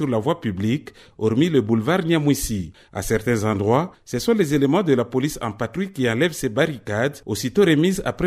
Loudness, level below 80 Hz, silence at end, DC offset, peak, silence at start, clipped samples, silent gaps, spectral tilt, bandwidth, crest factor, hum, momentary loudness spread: -21 LUFS; -46 dBFS; 0 s; under 0.1%; -4 dBFS; 0 s; under 0.1%; none; -6 dB/octave; 15.5 kHz; 16 dB; none; 8 LU